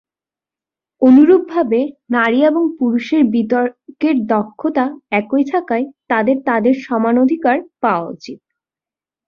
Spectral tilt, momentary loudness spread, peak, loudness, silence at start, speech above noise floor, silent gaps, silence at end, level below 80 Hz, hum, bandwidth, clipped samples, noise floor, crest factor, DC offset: -7.5 dB/octave; 9 LU; -2 dBFS; -15 LUFS; 1 s; 75 dB; none; 0.9 s; -60 dBFS; none; 6.8 kHz; under 0.1%; -90 dBFS; 14 dB; under 0.1%